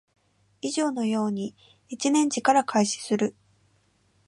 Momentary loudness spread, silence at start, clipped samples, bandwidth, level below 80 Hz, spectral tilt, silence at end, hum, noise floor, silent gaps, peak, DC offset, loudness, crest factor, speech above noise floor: 12 LU; 0.65 s; under 0.1%; 11.5 kHz; -74 dBFS; -4 dB/octave; 0.95 s; none; -66 dBFS; none; -8 dBFS; under 0.1%; -25 LUFS; 20 dB; 41 dB